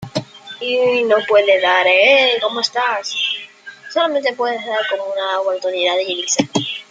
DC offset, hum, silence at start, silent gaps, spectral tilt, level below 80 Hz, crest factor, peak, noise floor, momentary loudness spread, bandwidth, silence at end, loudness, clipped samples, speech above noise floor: under 0.1%; none; 0 s; none; -2.5 dB/octave; -64 dBFS; 16 dB; 0 dBFS; -37 dBFS; 13 LU; 9.4 kHz; 0.1 s; -16 LUFS; under 0.1%; 21 dB